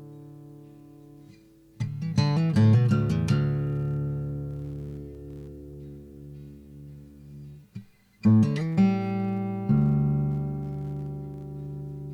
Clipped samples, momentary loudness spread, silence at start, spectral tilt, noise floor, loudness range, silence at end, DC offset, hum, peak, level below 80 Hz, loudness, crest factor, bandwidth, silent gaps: under 0.1%; 24 LU; 0 s; -8.5 dB/octave; -54 dBFS; 15 LU; 0 s; under 0.1%; none; -10 dBFS; -48 dBFS; -26 LUFS; 16 dB; 9.8 kHz; none